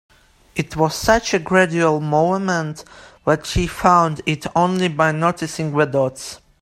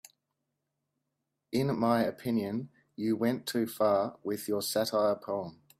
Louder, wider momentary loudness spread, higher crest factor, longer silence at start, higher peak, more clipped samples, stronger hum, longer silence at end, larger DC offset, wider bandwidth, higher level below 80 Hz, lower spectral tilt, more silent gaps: first, -18 LUFS vs -31 LUFS; about the same, 11 LU vs 9 LU; about the same, 18 dB vs 18 dB; second, 0.55 s vs 1.5 s; first, 0 dBFS vs -14 dBFS; neither; neither; about the same, 0.25 s vs 0.25 s; neither; about the same, 15.5 kHz vs 16 kHz; first, -38 dBFS vs -72 dBFS; about the same, -5 dB/octave vs -5.5 dB/octave; neither